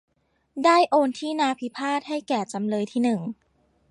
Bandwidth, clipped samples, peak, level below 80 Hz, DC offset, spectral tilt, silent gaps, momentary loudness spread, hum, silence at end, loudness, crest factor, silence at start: 11 kHz; under 0.1%; -6 dBFS; -74 dBFS; under 0.1%; -5 dB/octave; none; 11 LU; none; 0.55 s; -24 LUFS; 18 dB; 0.55 s